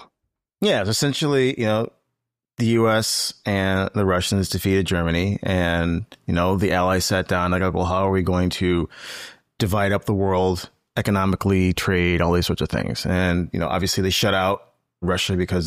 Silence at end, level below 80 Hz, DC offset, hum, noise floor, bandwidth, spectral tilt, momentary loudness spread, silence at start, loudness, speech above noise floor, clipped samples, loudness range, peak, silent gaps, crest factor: 0 s; -42 dBFS; 0.2%; none; -81 dBFS; 15.5 kHz; -5 dB/octave; 6 LU; 0 s; -21 LUFS; 60 dB; under 0.1%; 1 LU; -8 dBFS; none; 12 dB